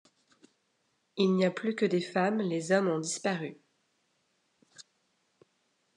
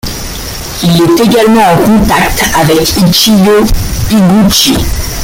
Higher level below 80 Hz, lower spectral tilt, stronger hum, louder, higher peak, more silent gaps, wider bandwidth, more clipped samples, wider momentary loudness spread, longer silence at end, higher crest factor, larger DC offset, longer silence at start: second, -88 dBFS vs -20 dBFS; about the same, -5 dB/octave vs -4.5 dB/octave; neither; second, -30 LUFS vs -7 LUFS; second, -14 dBFS vs 0 dBFS; neither; second, 10.5 kHz vs 17.5 kHz; neither; about the same, 8 LU vs 10 LU; first, 1.15 s vs 0 s; first, 18 dB vs 8 dB; neither; first, 1.15 s vs 0.05 s